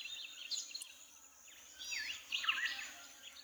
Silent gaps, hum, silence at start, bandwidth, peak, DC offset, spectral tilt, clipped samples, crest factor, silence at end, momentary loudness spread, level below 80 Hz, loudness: none; none; 0 s; over 20 kHz; -22 dBFS; under 0.1%; 3 dB/octave; under 0.1%; 22 dB; 0 s; 20 LU; -82 dBFS; -41 LUFS